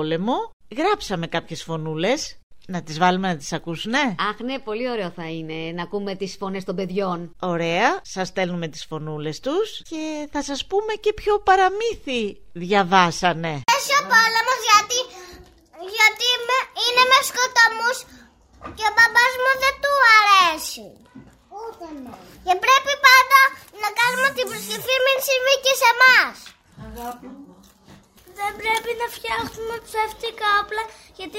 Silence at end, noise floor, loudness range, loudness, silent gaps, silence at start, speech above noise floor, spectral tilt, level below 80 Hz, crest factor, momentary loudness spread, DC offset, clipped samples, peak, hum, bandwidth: 0 s; -50 dBFS; 9 LU; -19 LUFS; 0.53-0.60 s, 2.43-2.50 s; 0 s; 29 dB; -2.5 dB/octave; -52 dBFS; 22 dB; 17 LU; under 0.1%; under 0.1%; 0 dBFS; none; 16 kHz